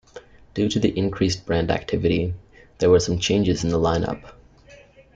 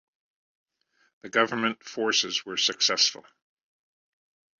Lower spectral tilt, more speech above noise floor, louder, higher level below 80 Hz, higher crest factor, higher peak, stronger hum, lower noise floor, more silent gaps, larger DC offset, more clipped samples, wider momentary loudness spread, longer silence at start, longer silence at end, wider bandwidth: first, -5.5 dB/octave vs -1 dB/octave; second, 29 dB vs 43 dB; first, -22 LUFS vs -25 LUFS; first, -44 dBFS vs -74 dBFS; about the same, 18 dB vs 22 dB; about the same, -6 dBFS vs -8 dBFS; neither; second, -49 dBFS vs -70 dBFS; neither; neither; neither; first, 11 LU vs 7 LU; second, 0.15 s vs 1.25 s; second, 0.4 s vs 1.4 s; first, 9.2 kHz vs 7.8 kHz